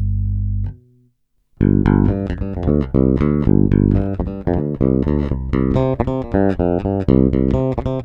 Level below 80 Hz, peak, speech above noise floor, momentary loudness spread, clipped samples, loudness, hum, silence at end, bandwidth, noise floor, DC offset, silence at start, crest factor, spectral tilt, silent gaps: -26 dBFS; 0 dBFS; 47 dB; 8 LU; under 0.1%; -17 LUFS; none; 0 s; 5.4 kHz; -60 dBFS; under 0.1%; 0 s; 16 dB; -11 dB/octave; none